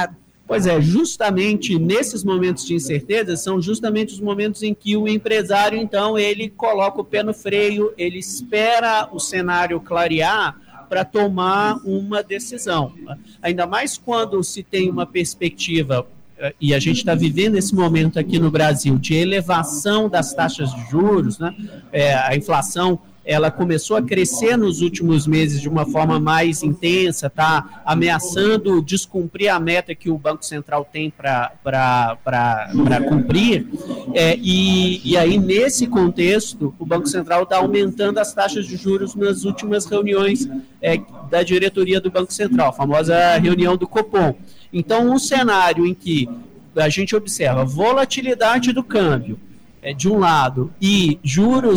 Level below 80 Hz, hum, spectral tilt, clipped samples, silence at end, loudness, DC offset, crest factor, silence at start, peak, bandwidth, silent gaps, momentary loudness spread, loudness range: -48 dBFS; none; -5 dB/octave; under 0.1%; 0 s; -18 LUFS; under 0.1%; 10 dB; 0 s; -8 dBFS; over 20 kHz; none; 8 LU; 4 LU